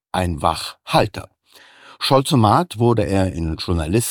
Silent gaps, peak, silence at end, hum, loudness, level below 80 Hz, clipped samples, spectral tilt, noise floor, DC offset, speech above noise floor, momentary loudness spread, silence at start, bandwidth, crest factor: none; -2 dBFS; 0 s; none; -19 LUFS; -38 dBFS; under 0.1%; -5.5 dB/octave; -49 dBFS; under 0.1%; 31 dB; 10 LU; 0.15 s; 19 kHz; 18 dB